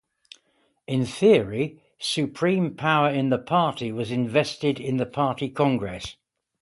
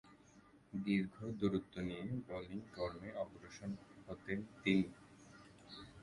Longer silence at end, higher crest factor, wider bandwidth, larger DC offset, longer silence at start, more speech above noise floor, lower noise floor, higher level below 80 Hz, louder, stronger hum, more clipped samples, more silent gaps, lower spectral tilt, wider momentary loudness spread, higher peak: first, 0.5 s vs 0 s; about the same, 18 dB vs 22 dB; about the same, 11.5 kHz vs 11.5 kHz; neither; first, 0.9 s vs 0.05 s; first, 45 dB vs 24 dB; about the same, -68 dBFS vs -65 dBFS; first, -58 dBFS vs -66 dBFS; first, -24 LUFS vs -42 LUFS; neither; neither; neither; about the same, -6 dB/octave vs -7 dB/octave; second, 9 LU vs 19 LU; first, -6 dBFS vs -20 dBFS